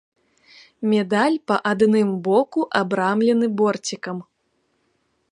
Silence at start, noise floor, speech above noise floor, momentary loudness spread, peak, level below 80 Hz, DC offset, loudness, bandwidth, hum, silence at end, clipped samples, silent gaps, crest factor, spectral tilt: 0.8 s; -69 dBFS; 49 dB; 10 LU; -2 dBFS; -70 dBFS; under 0.1%; -20 LUFS; 11 kHz; none; 1.1 s; under 0.1%; none; 18 dB; -5.5 dB/octave